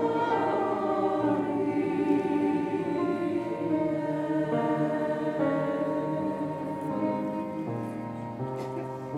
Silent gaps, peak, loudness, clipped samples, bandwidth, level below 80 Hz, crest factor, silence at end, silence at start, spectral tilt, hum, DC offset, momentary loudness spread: none; -14 dBFS; -29 LUFS; under 0.1%; 11 kHz; -66 dBFS; 14 dB; 0 s; 0 s; -8 dB/octave; none; under 0.1%; 8 LU